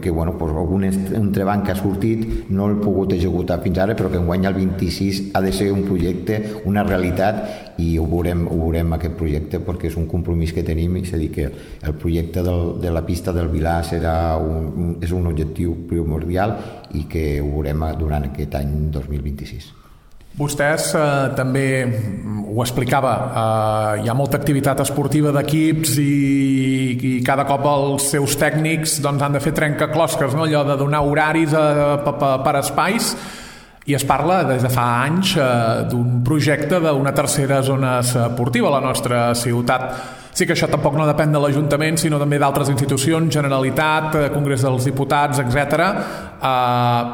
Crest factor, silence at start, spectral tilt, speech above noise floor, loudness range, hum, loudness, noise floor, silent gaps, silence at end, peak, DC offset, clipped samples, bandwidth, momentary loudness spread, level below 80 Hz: 16 dB; 0 s; -5.5 dB/octave; 25 dB; 5 LU; none; -19 LUFS; -43 dBFS; none; 0 s; -2 dBFS; under 0.1%; under 0.1%; 19 kHz; 7 LU; -34 dBFS